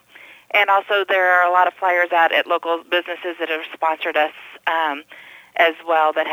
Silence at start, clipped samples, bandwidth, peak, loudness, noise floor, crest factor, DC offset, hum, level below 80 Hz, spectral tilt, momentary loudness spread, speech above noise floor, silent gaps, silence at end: 0.55 s; under 0.1%; 19 kHz; -2 dBFS; -18 LUFS; -45 dBFS; 16 dB; under 0.1%; none; -78 dBFS; -2.5 dB/octave; 9 LU; 27 dB; none; 0 s